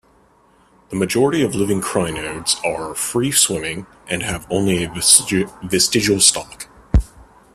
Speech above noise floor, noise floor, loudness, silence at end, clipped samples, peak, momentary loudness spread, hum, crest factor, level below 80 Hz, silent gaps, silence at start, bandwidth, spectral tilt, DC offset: 36 dB; -54 dBFS; -17 LUFS; 0.3 s; under 0.1%; 0 dBFS; 15 LU; none; 20 dB; -32 dBFS; none; 0.9 s; 16 kHz; -3 dB/octave; under 0.1%